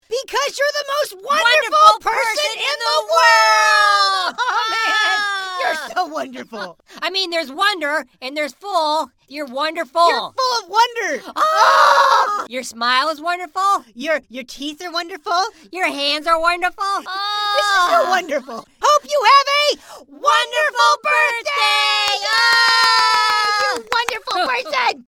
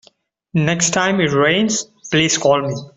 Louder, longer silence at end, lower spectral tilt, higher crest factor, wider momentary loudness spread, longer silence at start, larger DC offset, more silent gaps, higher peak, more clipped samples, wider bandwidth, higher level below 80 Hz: about the same, -16 LUFS vs -16 LUFS; about the same, 0.1 s vs 0.1 s; second, 0.5 dB/octave vs -3.5 dB/octave; about the same, 18 dB vs 16 dB; first, 13 LU vs 5 LU; second, 0.1 s vs 0.55 s; neither; neither; about the same, 0 dBFS vs -2 dBFS; neither; first, 18 kHz vs 8.4 kHz; second, -58 dBFS vs -52 dBFS